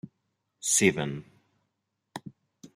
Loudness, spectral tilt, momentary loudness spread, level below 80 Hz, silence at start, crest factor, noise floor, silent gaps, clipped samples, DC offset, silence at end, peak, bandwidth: -25 LUFS; -3 dB/octave; 22 LU; -68 dBFS; 0.05 s; 24 dB; -81 dBFS; none; under 0.1%; under 0.1%; 0.1 s; -8 dBFS; 14.5 kHz